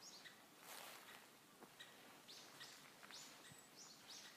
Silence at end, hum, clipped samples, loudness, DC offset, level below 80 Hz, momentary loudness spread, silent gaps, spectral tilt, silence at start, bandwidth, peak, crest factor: 0 s; none; under 0.1%; -59 LUFS; under 0.1%; under -90 dBFS; 6 LU; none; -1 dB/octave; 0 s; 15.5 kHz; -38 dBFS; 22 dB